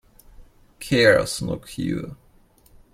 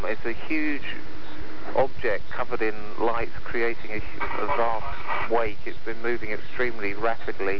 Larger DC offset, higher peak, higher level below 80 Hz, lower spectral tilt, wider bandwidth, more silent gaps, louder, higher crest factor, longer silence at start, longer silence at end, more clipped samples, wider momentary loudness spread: second, under 0.1% vs 10%; first, -2 dBFS vs -10 dBFS; about the same, -48 dBFS vs -46 dBFS; second, -4.5 dB/octave vs -7 dB/octave; first, 16 kHz vs 5.4 kHz; neither; first, -21 LUFS vs -29 LUFS; first, 22 dB vs 16 dB; first, 0.4 s vs 0 s; first, 0.8 s vs 0 s; neither; first, 19 LU vs 9 LU